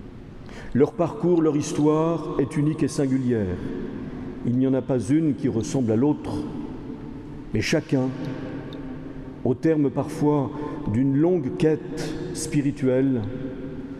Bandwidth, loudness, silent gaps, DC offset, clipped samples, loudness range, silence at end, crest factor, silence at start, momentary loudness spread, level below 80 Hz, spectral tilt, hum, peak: 12.5 kHz; -24 LUFS; none; under 0.1%; under 0.1%; 3 LU; 0 s; 16 dB; 0 s; 14 LU; -46 dBFS; -7 dB/octave; none; -8 dBFS